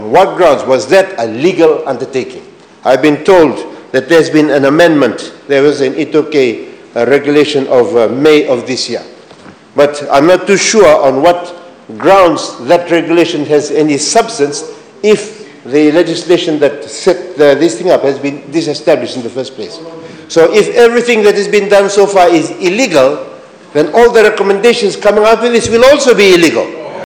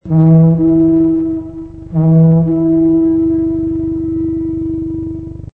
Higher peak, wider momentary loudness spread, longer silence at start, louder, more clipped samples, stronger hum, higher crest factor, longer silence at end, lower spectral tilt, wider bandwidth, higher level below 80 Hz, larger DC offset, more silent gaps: about the same, 0 dBFS vs 0 dBFS; about the same, 12 LU vs 13 LU; about the same, 0 s vs 0.05 s; first, -9 LUFS vs -12 LUFS; first, 4% vs under 0.1%; second, none vs 50 Hz at -40 dBFS; about the same, 10 dB vs 10 dB; second, 0 s vs 0.15 s; second, -4 dB/octave vs -13.5 dB/octave; first, 17 kHz vs 2.1 kHz; second, -46 dBFS vs -34 dBFS; neither; neither